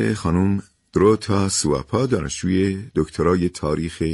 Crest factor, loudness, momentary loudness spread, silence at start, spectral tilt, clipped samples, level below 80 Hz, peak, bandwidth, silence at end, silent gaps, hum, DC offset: 16 dB; -21 LUFS; 7 LU; 0 s; -5.5 dB/octave; under 0.1%; -40 dBFS; -4 dBFS; 11.5 kHz; 0 s; none; none; under 0.1%